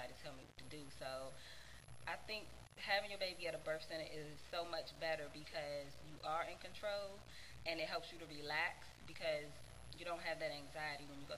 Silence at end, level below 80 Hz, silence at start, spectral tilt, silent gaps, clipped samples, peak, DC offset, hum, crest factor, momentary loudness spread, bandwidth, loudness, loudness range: 0 s; -66 dBFS; 0 s; -3.5 dB/octave; none; under 0.1%; -22 dBFS; 0.1%; none; 24 dB; 15 LU; 16 kHz; -46 LUFS; 2 LU